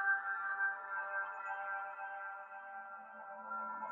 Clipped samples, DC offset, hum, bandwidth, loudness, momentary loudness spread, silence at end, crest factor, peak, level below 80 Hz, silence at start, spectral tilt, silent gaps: under 0.1%; under 0.1%; none; 7.2 kHz; -41 LUFS; 13 LU; 0 s; 16 dB; -24 dBFS; under -90 dBFS; 0 s; 0 dB/octave; none